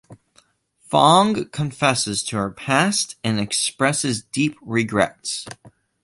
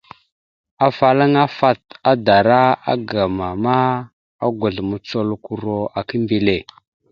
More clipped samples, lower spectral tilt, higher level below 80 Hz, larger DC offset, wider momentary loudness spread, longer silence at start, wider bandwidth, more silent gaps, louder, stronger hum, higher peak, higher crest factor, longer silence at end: neither; second, -3.5 dB/octave vs -8 dB/octave; second, -56 dBFS vs -48 dBFS; neither; about the same, 11 LU vs 10 LU; second, 0.1 s vs 0.8 s; first, 11.5 kHz vs 7 kHz; second, none vs 4.13-4.39 s; about the same, -20 LUFS vs -18 LUFS; neither; about the same, -2 dBFS vs 0 dBFS; about the same, 20 dB vs 18 dB; second, 0.35 s vs 0.5 s